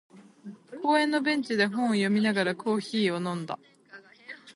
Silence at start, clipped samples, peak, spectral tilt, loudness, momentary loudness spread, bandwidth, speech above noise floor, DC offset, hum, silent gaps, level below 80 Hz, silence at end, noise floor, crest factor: 0.15 s; under 0.1%; -10 dBFS; -5.5 dB/octave; -27 LUFS; 21 LU; 11.5 kHz; 26 dB; under 0.1%; none; none; -76 dBFS; 0.05 s; -52 dBFS; 18 dB